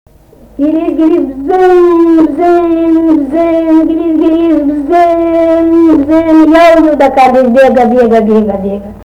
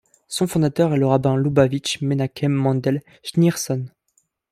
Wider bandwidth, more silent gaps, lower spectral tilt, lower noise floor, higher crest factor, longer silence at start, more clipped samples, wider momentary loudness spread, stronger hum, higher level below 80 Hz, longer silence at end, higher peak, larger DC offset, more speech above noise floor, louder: second, 7.8 kHz vs 15.5 kHz; neither; about the same, -7 dB/octave vs -6 dB/octave; second, -38 dBFS vs -67 dBFS; second, 6 dB vs 18 dB; first, 0.6 s vs 0.3 s; first, 0.5% vs under 0.1%; about the same, 6 LU vs 8 LU; neither; first, -36 dBFS vs -54 dBFS; second, 0 s vs 0.65 s; first, 0 dBFS vs -4 dBFS; neither; second, 31 dB vs 47 dB; first, -7 LUFS vs -20 LUFS